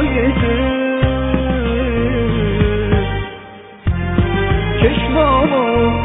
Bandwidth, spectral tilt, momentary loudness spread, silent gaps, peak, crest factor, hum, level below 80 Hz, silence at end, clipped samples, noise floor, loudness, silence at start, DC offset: 4 kHz; -10.5 dB/octave; 8 LU; none; -2 dBFS; 14 dB; none; -22 dBFS; 0 s; under 0.1%; -36 dBFS; -16 LUFS; 0 s; under 0.1%